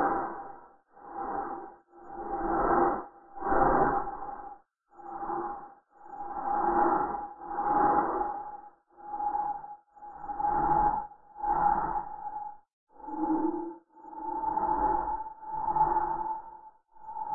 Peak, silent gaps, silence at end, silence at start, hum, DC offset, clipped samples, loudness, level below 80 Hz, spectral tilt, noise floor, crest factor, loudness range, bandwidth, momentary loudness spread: -12 dBFS; 12.73-12.87 s; 0 s; 0 s; none; under 0.1%; under 0.1%; -30 LUFS; -50 dBFS; -10 dB/octave; -55 dBFS; 18 dB; 3 LU; 2.2 kHz; 21 LU